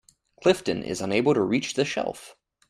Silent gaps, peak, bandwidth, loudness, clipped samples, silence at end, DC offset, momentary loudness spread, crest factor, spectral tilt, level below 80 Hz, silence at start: none; -6 dBFS; 13.5 kHz; -25 LUFS; under 0.1%; 0.4 s; under 0.1%; 8 LU; 20 dB; -5 dB/octave; -60 dBFS; 0.4 s